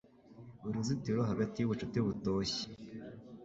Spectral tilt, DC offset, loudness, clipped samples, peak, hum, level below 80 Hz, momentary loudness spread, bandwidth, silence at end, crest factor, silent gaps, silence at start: -6 dB/octave; under 0.1%; -36 LUFS; under 0.1%; -20 dBFS; none; -62 dBFS; 15 LU; 8 kHz; 0 s; 16 dB; none; 0.25 s